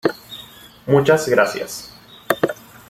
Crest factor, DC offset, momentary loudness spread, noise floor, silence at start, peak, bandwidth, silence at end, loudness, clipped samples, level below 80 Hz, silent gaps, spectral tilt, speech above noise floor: 20 dB; under 0.1%; 20 LU; -42 dBFS; 0.05 s; 0 dBFS; 16.5 kHz; 0.35 s; -18 LUFS; under 0.1%; -56 dBFS; none; -5 dB/octave; 25 dB